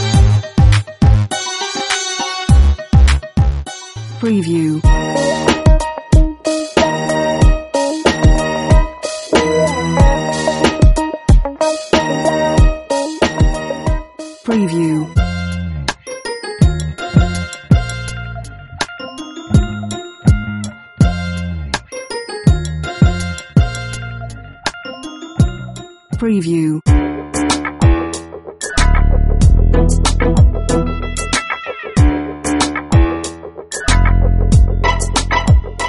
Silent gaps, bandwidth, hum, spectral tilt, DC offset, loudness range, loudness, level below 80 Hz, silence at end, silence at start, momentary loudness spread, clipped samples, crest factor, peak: none; 11.5 kHz; none; -5.5 dB/octave; under 0.1%; 4 LU; -15 LUFS; -18 dBFS; 0 s; 0 s; 13 LU; under 0.1%; 14 dB; 0 dBFS